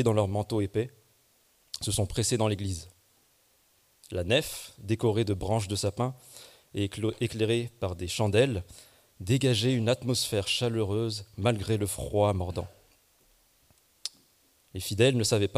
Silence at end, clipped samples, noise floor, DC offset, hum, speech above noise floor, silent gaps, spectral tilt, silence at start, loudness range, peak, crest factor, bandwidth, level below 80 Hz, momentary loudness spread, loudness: 0 s; under 0.1%; -66 dBFS; under 0.1%; none; 38 dB; none; -5 dB/octave; 0 s; 5 LU; -12 dBFS; 18 dB; 15.5 kHz; -54 dBFS; 15 LU; -29 LUFS